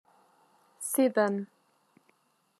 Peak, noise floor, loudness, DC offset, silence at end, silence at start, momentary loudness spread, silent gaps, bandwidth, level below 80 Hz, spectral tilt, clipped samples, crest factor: -14 dBFS; -70 dBFS; -29 LUFS; under 0.1%; 1.15 s; 0.8 s; 14 LU; none; 13.5 kHz; under -90 dBFS; -4.5 dB/octave; under 0.1%; 20 dB